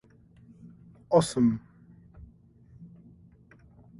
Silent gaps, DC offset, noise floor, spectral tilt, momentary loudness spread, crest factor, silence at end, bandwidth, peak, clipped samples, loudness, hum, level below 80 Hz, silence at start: none; under 0.1%; -56 dBFS; -6.5 dB/octave; 28 LU; 24 dB; 1.15 s; 11.5 kHz; -10 dBFS; under 0.1%; -26 LUFS; none; -58 dBFS; 0.65 s